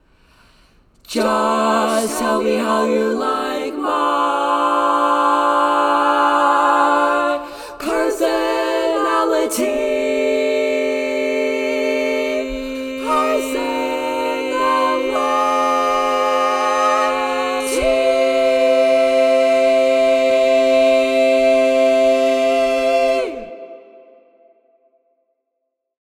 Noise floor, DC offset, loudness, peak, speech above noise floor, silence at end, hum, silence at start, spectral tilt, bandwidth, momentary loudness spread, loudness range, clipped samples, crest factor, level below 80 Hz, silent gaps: -75 dBFS; under 0.1%; -16 LUFS; -2 dBFS; 58 dB; 2.2 s; none; 1.1 s; -3 dB/octave; 17.5 kHz; 7 LU; 5 LU; under 0.1%; 14 dB; -48 dBFS; none